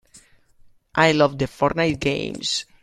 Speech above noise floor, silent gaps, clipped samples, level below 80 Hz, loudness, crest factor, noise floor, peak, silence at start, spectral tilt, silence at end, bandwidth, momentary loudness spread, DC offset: 32 dB; none; under 0.1%; -48 dBFS; -21 LUFS; 22 dB; -53 dBFS; -2 dBFS; 0.15 s; -4.5 dB/octave; 0.2 s; 13.5 kHz; 8 LU; under 0.1%